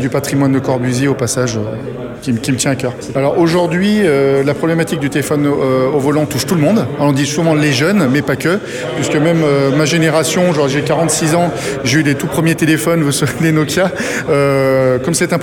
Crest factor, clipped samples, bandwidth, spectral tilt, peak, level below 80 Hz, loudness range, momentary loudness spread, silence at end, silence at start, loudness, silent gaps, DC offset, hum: 12 dB; under 0.1%; 19 kHz; -5 dB/octave; -2 dBFS; -44 dBFS; 2 LU; 5 LU; 0 s; 0 s; -13 LUFS; none; under 0.1%; none